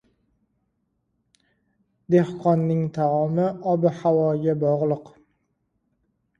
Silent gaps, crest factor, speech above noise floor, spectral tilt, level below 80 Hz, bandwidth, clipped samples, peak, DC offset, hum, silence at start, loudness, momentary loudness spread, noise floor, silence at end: none; 18 dB; 52 dB; -10 dB/octave; -64 dBFS; 7.2 kHz; under 0.1%; -6 dBFS; under 0.1%; none; 2.1 s; -22 LUFS; 3 LU; -73 dBFS; 1.3 s